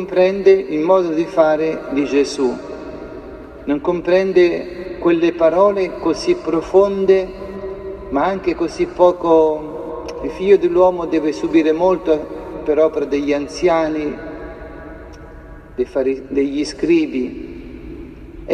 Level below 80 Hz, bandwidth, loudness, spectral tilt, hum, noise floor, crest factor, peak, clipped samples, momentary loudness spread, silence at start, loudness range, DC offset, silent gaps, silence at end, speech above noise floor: -42 dBFS; 9.4 kHz; -17 LUFS; -6 dB/octave; none; -37 dBFS; 16 dB; 0 dBFS; under 0.1%; 19 LU; 0 s; 5 LU; under 0.1%; none; 0 s; 21 dB